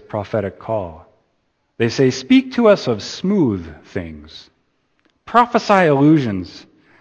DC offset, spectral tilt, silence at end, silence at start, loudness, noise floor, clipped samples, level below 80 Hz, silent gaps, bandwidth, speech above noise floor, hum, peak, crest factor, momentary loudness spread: under 0.1%; -6.5 dB/octave; 0.4 s; 0.15 s; -16 LUFS; -66 dBFS; under 0.1%; -52 dBFS; none; 8.4 kHz; 50 dB; none; 0 dBFS; 18 dB; 16 LU